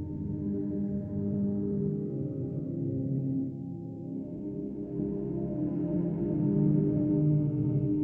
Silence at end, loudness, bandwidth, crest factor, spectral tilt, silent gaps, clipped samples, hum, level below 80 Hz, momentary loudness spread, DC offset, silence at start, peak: 0 s; -31 LUFS; 2.3 kHz; 14 dB; -14 dB/octave; none; under 0.1%; none; -54 dBFS; 11 LU; under 0.1%; 0 s; -16 dBFS